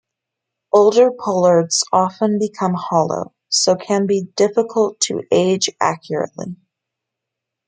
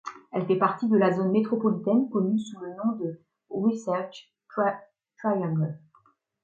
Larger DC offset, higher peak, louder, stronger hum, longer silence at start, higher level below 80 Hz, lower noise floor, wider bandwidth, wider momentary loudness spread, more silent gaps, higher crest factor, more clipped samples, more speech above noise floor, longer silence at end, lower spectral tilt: neither; first, -2 dBFS vs -10 dBFS; first, -17 LUFS vs -27 LUFS; neither; first, 0.75 s vs 0.05 s; first, -66 dBFS vs -76 dBFS; first, -82 dBFS vs -64 dBFS; first, 9.6 kHz vs 7.6 kHz; second, 9 LU vs 14 LU; neither; about the same, 16 dB vs 18 dB; neither; first, 65 dB vs 38 dB; first, 1.15 s vs 0.65 s; second, -4 dB/octave vs -8 dB/octave